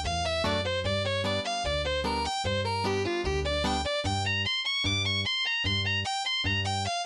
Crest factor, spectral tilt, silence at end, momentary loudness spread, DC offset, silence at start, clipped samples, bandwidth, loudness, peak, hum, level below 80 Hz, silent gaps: 14 dB; -4 dB/octave; 0 s; 3 LU; under 0.1%; 0 s; under 0.1%; 11.5 kHz; -28 LUFS; -16 dBFS; none; -42 dBFS; none